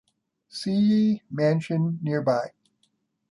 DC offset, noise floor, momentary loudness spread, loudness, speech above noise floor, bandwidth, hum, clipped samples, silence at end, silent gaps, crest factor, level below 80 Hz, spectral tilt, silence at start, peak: under 0.1%; -71 dBFS; 11 LU; -24 LUFS; 48 dB; 11.5 kHz; none; under 0.1%; 0.85 s; none; 14 dB; -70 dBFS; -7.5 dB/octave; 0.55 s; -10 dBFS